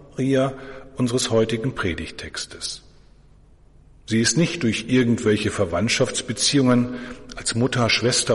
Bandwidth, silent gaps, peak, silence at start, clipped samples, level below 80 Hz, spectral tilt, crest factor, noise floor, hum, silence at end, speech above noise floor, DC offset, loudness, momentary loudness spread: 11.5 kHz; none; -6 dBFS; 0 s; under 0.1%; -48 dBFS; -4 dB/octave; 16 dB; -51 dBFS; none; 0 s; 30 dB; under 0.1%; -21 LUFS; 13 LU